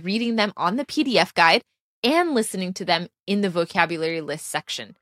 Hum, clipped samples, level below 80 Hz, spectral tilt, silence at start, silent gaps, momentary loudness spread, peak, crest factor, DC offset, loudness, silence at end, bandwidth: none; under 0.1%; -70 dBFS; -4 dB/octave; 0 s; 1.80-2.03 s; 11 LU; -2 dBFS; 22 dB; under 0.1%; -22 LUFS; 0.1 s; 15 kHz